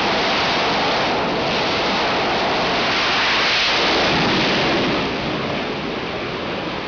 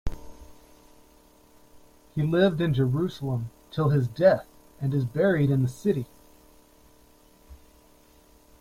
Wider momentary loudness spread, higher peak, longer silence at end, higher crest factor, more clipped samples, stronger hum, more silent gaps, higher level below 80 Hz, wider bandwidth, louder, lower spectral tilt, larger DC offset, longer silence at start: second, 9 LU vs 13 LU; about the same, -8 dBFS vs -8 dBFS; second, 0 s vs 1.05 s; second, 10 dB vs 20 dB; neither; neither; neither; about the same, -44 dBFS vs -48 dBFS; second, 5.4 kHz vs 15.5 kHz; first, -18 LUFS vs -25 LUFS; second, -4 dB/octave vs -8 dB/octave; neither; about the same, 0 s vs 0.05 s